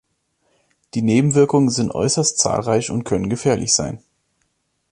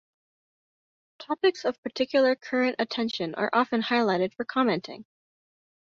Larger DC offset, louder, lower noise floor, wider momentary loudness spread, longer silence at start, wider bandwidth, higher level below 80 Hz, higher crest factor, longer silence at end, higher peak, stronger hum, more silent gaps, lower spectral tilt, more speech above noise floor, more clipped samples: neither; first, -18 LUFS vs -26 LUFS; second, -69 dBFS vs under -90 dBFS; about the same, 8 LU vs 8 LU; second, 0.95 s vs 1.2 s; first, 11.5 kHz vs 7.4 kHz; first, -48 dBFS vs -72 dBFS; about the same, 18 dB vs 20 dB; about the same, 0.95 s vs 0.95 s; first, -2 dBFS vs -8 dBFS; neither; second, none vs 1.78-1.83 s; about the same, -4.5 dB/octave vs -5.5 dB/octave; second, 51 dB vs over 64 dB; neither